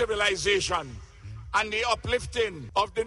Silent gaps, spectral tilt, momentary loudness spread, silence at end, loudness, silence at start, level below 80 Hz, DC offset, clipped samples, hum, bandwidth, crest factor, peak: none; -3 dB/octave; 18 LU; 0 s; -27 LUFS; 0 s; -46 dBFS; under 0.1%; under 0.1%; none; 11.5 kHz; 18 dB; -10 dBFS